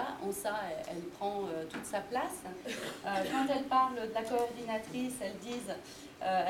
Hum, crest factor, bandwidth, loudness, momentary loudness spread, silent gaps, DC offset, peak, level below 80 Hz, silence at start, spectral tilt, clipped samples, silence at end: none; 18 dB; 17.5 kHz; -36 LUFS; 11 LU; none; under 0.1%; -18 dBFS; -68 dBFS; 0 s; -4 dB/octave; under 0.1%; 0 s